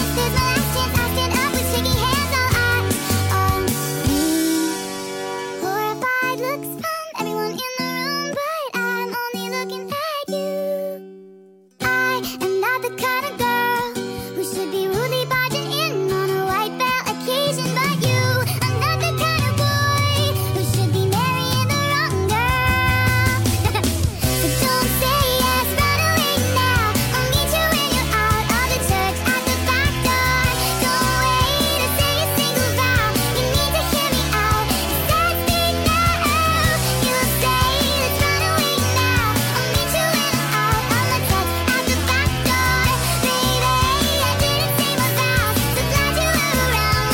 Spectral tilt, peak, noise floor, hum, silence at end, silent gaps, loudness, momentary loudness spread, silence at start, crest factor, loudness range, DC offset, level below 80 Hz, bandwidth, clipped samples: -4 dB/octave; -6 dBFS; -47 dBFS; none; 0 s; none; -19 LUFS; 7 LU; 0 s; 14 dB; 6 LU; under 0.1%; -32 dBFS; 17 kHz; under 0.1%